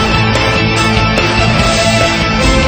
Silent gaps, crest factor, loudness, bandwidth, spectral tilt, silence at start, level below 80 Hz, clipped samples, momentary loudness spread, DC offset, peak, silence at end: none; 10 dB; -10 LUFS; over 20 kHz; -4.5 dB/octave; 0 s; -20 dBFS; under 0.1%; 1 LU; under 0.1%; 0 dBFS; 0 s